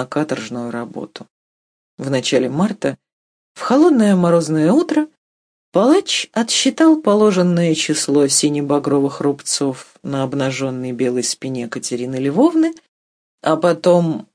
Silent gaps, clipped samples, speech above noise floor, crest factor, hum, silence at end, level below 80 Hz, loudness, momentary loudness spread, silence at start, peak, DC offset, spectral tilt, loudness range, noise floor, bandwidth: 1.30-1.98 s, 3.13-3.55 s, 5.17-5.72 s, 12.88-13.38 s; under 0.1%; over 74 dB; 14 dB; none; 0.1 s; -64 dBFS; -16 LUFS; 12 LU; 0 s; -2 dBFS; under 0.1%; -4.5 dB/octave; 6 LU; under -90 dBFS; 10.5 kHz